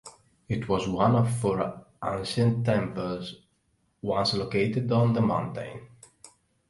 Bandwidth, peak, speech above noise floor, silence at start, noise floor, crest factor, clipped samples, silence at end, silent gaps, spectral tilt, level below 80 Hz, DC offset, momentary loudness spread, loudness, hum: 11.5 kHz; -8 dBFS; 45 dB; 0.05 s; -71 dBFS; 20 dB; under 0.1%; 0.4 s; none; -6.5 dB/octave; -54 dBFS; under 0.1%; 13 LU; -27 LUFS; none